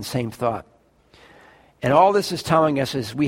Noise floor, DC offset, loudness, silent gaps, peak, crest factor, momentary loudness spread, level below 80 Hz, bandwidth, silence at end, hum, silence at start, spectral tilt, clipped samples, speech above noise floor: -54 dBFS; under 0.1%; -20 LUFS; none; -2 dBFS; 18 dB; 11 LU; -54 dBFS; 16.5 kHz; 0 s; none; 0 s; -5.5 dB/octave; under 0.1%; 34 dB